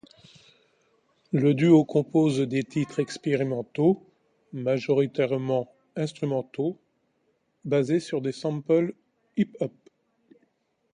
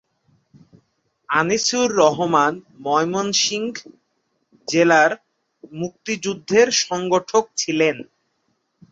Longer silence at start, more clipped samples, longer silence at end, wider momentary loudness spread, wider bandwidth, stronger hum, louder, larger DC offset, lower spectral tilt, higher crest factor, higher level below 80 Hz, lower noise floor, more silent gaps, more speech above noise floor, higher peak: about the same, 1.35 s vs 1.3 s; neither; first, 1.25 s vs 0.9 s; second, 11 LU vs 15 LU; first, 10 kHz vs 8 kHz; neither; second, -26 LUFS vs -19 LUFS; neither; first, -7.5 dB/octave vs -3 dB/octave; about the same, 20 dB vs 20 dB; second, -70 dBFS vs -64 dBFS; about the same, -71 dBFS vs -70 dBFS; neither; second, 47 dB vs 51 dB; second, -6 dBFS vs -2 dBFS